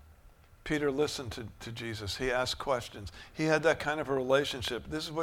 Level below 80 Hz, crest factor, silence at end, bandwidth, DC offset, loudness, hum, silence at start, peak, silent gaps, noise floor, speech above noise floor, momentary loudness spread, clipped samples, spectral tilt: -54 dBFS; 20 dB; 0 s; 16.5 kHz; under 0.1%; -32 LUFS; none; 0.05 s; -12 dBFS; none; -58 dBFS; 25 dB; 15 LU; under 0.1%; -4.5 dB/octave